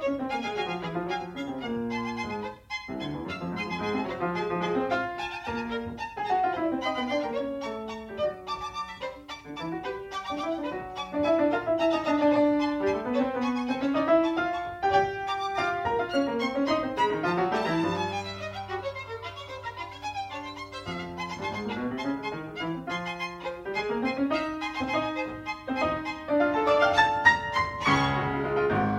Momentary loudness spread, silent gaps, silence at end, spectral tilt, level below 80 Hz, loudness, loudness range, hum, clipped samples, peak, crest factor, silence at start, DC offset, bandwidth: 12 LU; none; 0 s; -5.5 dB/octave; -56 dBFS; -29 LUFS; 9 LU; none; under 0.1%; -6 dBFS; 22 dB; 0 s; under 0.1%; 13.5 kHz